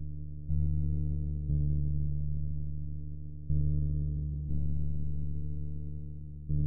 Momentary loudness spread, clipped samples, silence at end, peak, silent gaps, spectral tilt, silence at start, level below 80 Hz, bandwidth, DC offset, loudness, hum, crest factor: 10 LU; under 0.1%; 0 s; -18 dBFS; none; -19 dB/octave; 0 s; -36 dBFS; 0.8 kHz; under 0.1%; -35 LUFS; none; 12 dB